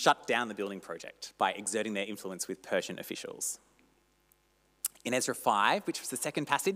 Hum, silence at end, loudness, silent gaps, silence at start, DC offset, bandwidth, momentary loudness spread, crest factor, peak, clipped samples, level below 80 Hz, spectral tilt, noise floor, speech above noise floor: 50 Hz at -75 dBFS; 0 s; -33 LUFS; none; 0 s; under 0.1%; 16 kHz; 13 LU; 22 dB; -12 dBFS; under 0.1%; -78 dBFS; -2.5 dB/octave; -70 dBFS; 38 dB